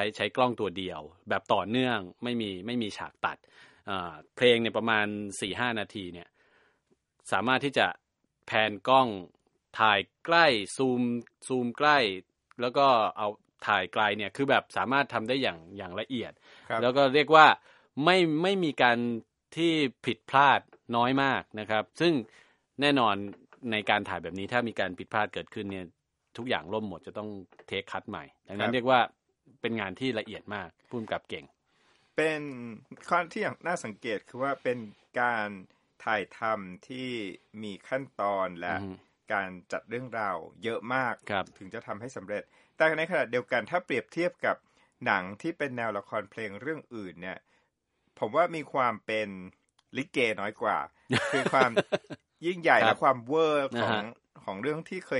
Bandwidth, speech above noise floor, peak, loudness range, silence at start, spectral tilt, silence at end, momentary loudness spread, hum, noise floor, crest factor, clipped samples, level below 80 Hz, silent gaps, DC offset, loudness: 11.5 kHz; 48 dB; -2 dBFS; 9 LU; 0 s; -5 dB/octave; 0 s; 16 LU; none; -76 dBFS; 28 dB; under 0.1%; -72 dBFS; none; under 0.1%; -28 LUFS